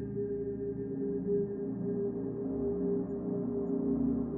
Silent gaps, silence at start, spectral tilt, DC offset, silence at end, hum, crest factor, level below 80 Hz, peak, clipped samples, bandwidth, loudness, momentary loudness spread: none; 0 s; -10.5 dB/octave; under 0.1%; 0 s; 60 Hz at -45 dBFS; 12 dB; -54 dBFS; -22 dBFS; under 0.1%; 2.1 kHz; -34 LUFS; 5 LU